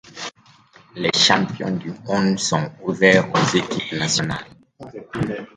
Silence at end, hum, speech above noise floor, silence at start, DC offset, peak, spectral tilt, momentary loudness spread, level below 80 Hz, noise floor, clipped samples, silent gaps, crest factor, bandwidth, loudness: 0.1 s; none; 31 dB; 0.15 s; under 0.1%; 0 dBFS; -4 dB/octave; 18 LU; -54 dBFS; -51 dBFS; under 0.1%; none; 20 dB; 9.6 kHz; -19 LUFS